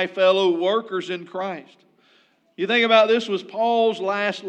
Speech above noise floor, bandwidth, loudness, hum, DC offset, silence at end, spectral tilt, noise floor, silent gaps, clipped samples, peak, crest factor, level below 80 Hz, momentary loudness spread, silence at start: 39 dB; 9 kHz; -21 LUFS; none; under 0.1%; 0 s; -4.5 dB/octave; -60 dBFS; none; under 0.1%; -2 dBFS; 20 dB; under -90 dBFS; 14 LU; 0 s